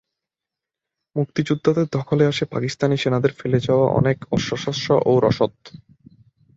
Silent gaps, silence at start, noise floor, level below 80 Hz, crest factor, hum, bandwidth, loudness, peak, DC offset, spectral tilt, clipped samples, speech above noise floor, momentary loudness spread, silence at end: none; 1.15 s; -87 dBFS; -52 dBFS; 18 dB; none; 7.8 kHz; -20 LUFS; -4 dBFS; under 0.1%; -6.5 dB/octave; under 0.1%; 67 dB; 7 LU; 0.8 s